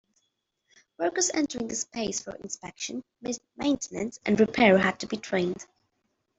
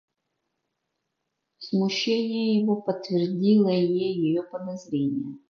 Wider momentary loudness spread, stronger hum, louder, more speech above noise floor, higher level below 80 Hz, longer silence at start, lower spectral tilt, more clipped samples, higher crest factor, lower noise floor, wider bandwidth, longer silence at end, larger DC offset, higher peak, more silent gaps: first, 15 LU vs 11 LU; neither; about the same, -27 LUFS vs -25 LUFS; second, 50 dB vs 56 dB; first, -62 dBFS vs -72 dBFS; second, 1 s vs 1.6 s; second, -4 dB/octave vs -6.5 dB/octave; neither; first, 22 dB vs 16 dB; about the same, -78 dBFS vs -80 dBFS; first, 8.2 kHz vs 7 kHz; first, 0.75 s vs 0.15 s; neither; first, -6 dBFS vs -10 dBFS; neither